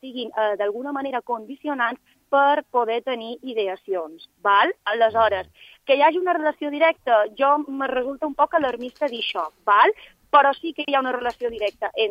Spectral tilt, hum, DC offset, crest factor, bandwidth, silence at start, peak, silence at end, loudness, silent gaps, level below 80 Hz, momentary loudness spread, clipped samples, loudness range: -4.5 dB/octave; none; under 0.1%; 18 dB; 7.6 kHz; 0.05 s; -4 dBFS; 0 s; -22 LUFS; none; -62 dBFS; 12 LU; under 0.1%; 4 LU